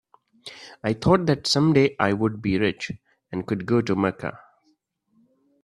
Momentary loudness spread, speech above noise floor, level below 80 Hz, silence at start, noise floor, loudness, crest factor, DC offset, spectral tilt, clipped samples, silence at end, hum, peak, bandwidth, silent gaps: 20 LU; 46 dB; -52 dBFS; 0.45 s; -68 dBFS; -23 LUFS; 22 dB; under 0.1%; -6 dB/octave; under 0.1%; 1.3 s; none; -4 dBFS; 12.5 kHz; none